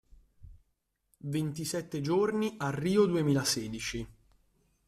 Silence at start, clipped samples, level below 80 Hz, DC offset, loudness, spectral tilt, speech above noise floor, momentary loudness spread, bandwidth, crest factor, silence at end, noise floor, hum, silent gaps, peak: 0.4 s; under 0.1%; -58 dBFS; under 0.1%; -31 LUFS; -5 dB/octave; 49 dB; 10 LU; 15 kHz; 18 dB; 0.75 s; -79 dBFS; none; none; -14 dBFS